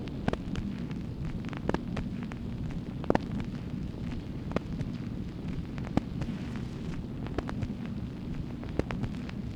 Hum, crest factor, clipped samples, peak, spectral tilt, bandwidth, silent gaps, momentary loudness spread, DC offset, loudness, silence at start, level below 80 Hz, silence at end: none; 28 dB; under 0.1%; -6 dBFS; -8 dB/octave; 12 kHz; none; 5 LU; under 0.1%; -36 LUFS; 0 s; -44 dBFS; 0 s